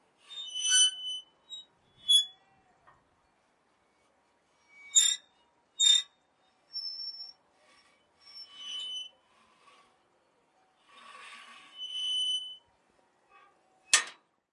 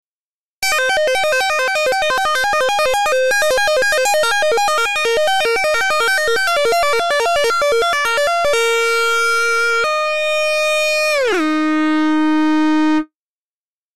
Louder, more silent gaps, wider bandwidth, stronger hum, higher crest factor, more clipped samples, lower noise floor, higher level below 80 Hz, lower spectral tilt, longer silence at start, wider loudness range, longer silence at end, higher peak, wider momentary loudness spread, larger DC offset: second, -27 LUFS vs -15 LUFS; second, none vs 0.24-0.62 s; second, 11.5 kHz vs 14 kHz; neither; first, 28 dB vs 6 dB; neither; second, -71 dBFS vs under -90 dBFS; second, -88 dBFS vs -48 dBFS; second, 5 dB/octave vs -1.5 dB/octave; first, 0.3 s vs 0 s; first, 16 LU vs 1 LU; first, 0.4 s vs 0 s; about the same, -8 dBFS vs -10 dBFS; first, 25 LU vs 2 LU; second, under 0.1% vs 2%